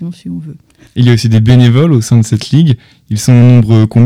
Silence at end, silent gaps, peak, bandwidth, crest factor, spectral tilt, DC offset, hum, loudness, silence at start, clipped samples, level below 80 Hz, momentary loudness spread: 0 s; none; 0 dBFS; 11 kHz; 8 dB; -7 dB/octave; under 0.1%; none; -8 LUFS; 0 s; under 0.1%; -38 dBFS; 17 LU